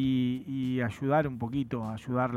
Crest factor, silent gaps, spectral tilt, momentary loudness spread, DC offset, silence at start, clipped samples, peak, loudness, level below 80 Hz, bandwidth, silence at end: 16 dB; none; -8 dB/octave; 6 LU; under 0.1%; 0 s; under 0.1%; -14 dBFS; -31 LUFS; -58 dBFS; 12 kHz; 0 s